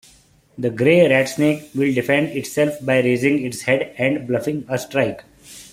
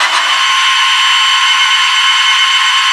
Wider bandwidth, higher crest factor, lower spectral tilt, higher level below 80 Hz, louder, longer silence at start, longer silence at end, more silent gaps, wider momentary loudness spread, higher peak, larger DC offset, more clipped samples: first, 16 kHz vs 12 kHz; first, 18 dB vs 10 dB; first, -5.5 dB/octave vs 5.5 dB/octave; first, -58 dBFS vs -70 dBFS; second, -19 LUFS vs -7 LUFS; first, 0.6 s vs 0 s; about the same, 0.05 s vs 0 s; neither; first, 9 LU vs 1 LU; about the same, -2 dBFS vs 0 dBFS; neither; neither